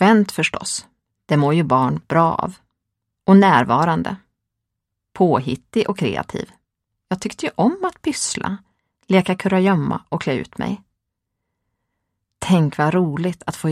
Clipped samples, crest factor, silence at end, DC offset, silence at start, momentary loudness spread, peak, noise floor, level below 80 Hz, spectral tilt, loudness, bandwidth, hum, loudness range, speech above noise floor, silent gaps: under 0.1%; 20 dB; 0 s; under 0.1%; 0 s; 13 LU; 0 dBFS; -80 dBFS; -54 dBFS; -6 dB/octave; -19 LUFS; 13.5 kHz; none; 6 LU; 62 dB; none